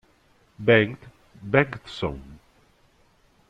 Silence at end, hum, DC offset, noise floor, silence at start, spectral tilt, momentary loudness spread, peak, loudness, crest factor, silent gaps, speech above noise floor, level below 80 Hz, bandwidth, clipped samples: 1.15 s; none; under 0.1%; -61 dBFS; 0.6 s; -7.5 dB/octave; 23 LU; -4 dBFS; -23 LUFS; 22 dB; none; 38 dB; -52 dBFS; 9.2 kHz; under 0.1%